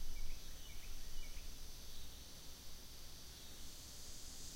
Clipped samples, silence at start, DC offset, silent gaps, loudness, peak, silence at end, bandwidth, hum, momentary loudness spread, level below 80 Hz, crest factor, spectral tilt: under 0.1%; 0 s; under 0.1%; none; -54 LUFS; -30 dBFS; 0 s; 16 kHz; none; 3 LU; -50 dBFS; 14 dB; -2 dB/octave